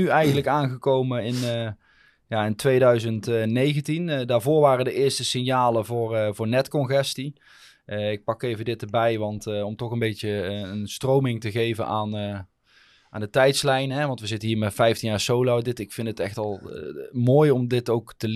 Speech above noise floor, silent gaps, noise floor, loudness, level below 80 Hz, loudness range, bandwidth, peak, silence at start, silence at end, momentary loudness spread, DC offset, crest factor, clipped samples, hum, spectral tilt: 36 dB; none; -59 dBFS; -24 LUFS; -60 dBFS; 5 LU; 14.5 kHz; -6 dBFS; 0 s; 0 s; 12 LU; under 0.1%; 18 dB; under 0.1%; none; -5.5 dB/octave